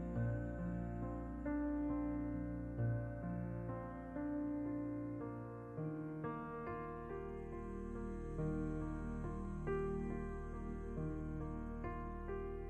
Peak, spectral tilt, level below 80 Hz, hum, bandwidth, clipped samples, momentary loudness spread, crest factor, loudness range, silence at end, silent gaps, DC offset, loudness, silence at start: -30 dBFS; -10 dB/octave; -50 dBFS; none; 8.8 kHz; under 0.1%; 6 LU; 12 dB; 3 LU; 0 s; none; under 0.1%; -44 LUFS; 0 s